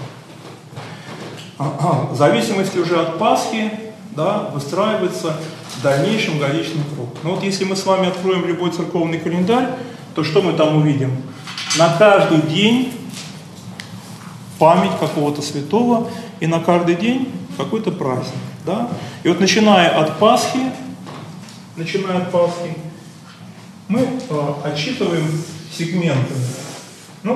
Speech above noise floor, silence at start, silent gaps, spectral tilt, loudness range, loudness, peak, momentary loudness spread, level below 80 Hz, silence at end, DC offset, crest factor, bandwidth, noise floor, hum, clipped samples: 21 dB; 0 s; none; -5.5 dB/octave; 6 LU; -18 LUFS; 0 dBFS; 20 LU; -64 dBFS; 0 s; under 0.1%; 18 dB; 13 kHz; -38 dBFS; none; under 0.1%